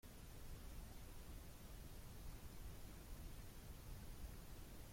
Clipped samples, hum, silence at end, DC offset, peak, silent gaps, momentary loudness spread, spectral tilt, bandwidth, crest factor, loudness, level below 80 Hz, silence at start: under 0.1%; none; 0 s; under 0.1%; -42 dBFS; none; 1 LU; -4.5 dB/octave; 16.5 kHz; 12 dB; -58 LUFS; -58 dBFS; 0.05 s